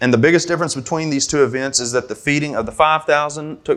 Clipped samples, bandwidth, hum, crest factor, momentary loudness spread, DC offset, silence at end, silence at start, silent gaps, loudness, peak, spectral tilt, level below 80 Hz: under 0.1%; 12.5 kHz; none; 16 dB; 8 LU; under 0.1%; 0 s; 0 s; none; -17 LUFS; 0 dBFS; -4 dB/octave; -48 dBFS